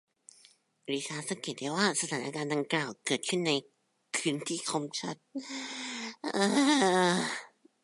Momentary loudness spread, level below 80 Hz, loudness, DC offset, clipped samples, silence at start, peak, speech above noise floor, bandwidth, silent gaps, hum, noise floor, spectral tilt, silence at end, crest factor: 13 LU; -82 dBFS; -31 LUFS; under 0.1%; under 0.1%; 0.9 s; -12 dBFS; 32 dB; 11.5 kHz; none; none; -63 dBFS; -3.5 dB/octave; 0.35 s; 20 dB